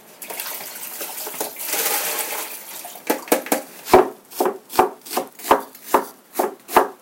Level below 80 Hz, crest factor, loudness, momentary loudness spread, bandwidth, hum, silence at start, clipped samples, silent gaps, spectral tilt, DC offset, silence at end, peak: -52 dBFS; 22 dB; -22 LUFS; 12 LU; 17 kHz; none; 0.1 s; under 0.1%; none; -2 dB/octave; under 0.1%; 0.05 s; 0 dBFS